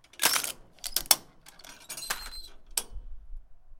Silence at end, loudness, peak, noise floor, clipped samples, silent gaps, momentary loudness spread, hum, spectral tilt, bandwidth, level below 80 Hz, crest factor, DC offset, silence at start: 0 s; -28 LUFS; 0 dBFS; -52 dBFS; under 0.1%; none; 24 LU; none; 1 dB/octave; 17 kHz; -48 dBFS; 32 dB; under 0.1%; 0.2 s